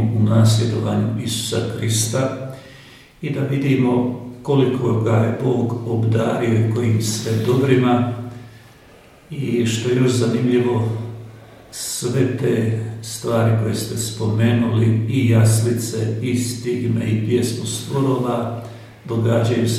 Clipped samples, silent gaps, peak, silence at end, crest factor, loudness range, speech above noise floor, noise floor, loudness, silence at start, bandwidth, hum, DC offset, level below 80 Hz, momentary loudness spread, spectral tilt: under 0.1%; none; -2 dBFS; 0 s; 18 dB; 3 LU; 28 dB; -46 dBFS; -19 LUFS; 0 s; 14.5 kHz; none; under 0.1%; -54 dBFS; 12 LU; -6 dB/octave